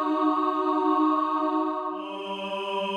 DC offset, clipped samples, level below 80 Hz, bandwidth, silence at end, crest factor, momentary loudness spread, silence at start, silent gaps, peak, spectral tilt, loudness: under 0.1%; under 0.1%; -78 dBFS; 9 kHz; 0 s; 14 dB; 10 LU; 0 s; none; -12 dBFS; -6 dB/octave; -26 LUFS